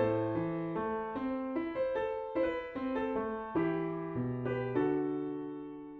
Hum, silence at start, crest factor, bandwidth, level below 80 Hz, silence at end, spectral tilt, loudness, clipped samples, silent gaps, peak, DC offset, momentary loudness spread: none; 0 s; 16 dB; 4.7 kHz; -62 dBFS; 0 s; -10 dB/octave; -35 LUFS; under 0.1%; none; -20 dBFS; under 0.1%; 5 LU